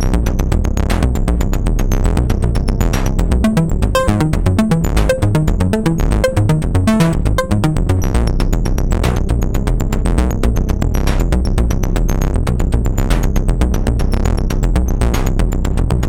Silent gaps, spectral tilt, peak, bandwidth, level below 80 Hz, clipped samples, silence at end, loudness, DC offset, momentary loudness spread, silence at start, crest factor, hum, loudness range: none; -6.5 dB/octave; 0 dBFS; 16.5 kHz; -16 dBFS; under 0.1%; 0 s; -16 LUFS; under 0.1%; 3 LU; 0 s; 14 dB; none; 2 LU